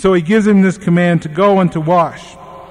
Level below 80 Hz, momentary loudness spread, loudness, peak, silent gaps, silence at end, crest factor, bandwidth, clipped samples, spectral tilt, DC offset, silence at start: -44 dBFS; 3 LU; -12 LUFS; -2 dBFS; none; 0.05 s; 10 dB; 10.5 kHz; under 0.1%; -7.5 dB/octave; under 0.1%; 0 s